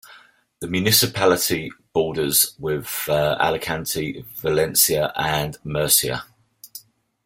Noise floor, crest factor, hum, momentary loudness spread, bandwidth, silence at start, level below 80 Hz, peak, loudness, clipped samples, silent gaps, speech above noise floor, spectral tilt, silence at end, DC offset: -50 dBFS; 22 dB; none; 13 LU; 16.5 kHz; 0.05 s; -50 dBFS; -2 dBFS; -20 LUFS; under 0.1%; none; 29 dB; -3 dB/octave; 0.45 s; under 0.1%